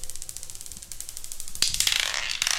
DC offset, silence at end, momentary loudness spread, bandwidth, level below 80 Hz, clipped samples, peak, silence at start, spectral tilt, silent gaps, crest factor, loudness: under 0.1%; 0 s; 16 LU; 17 kHz; -44 dBFS; under 0.1%; -2 dBFS; 0 s; 1.5 dB/octave; none; 26 dB; -26 LUFS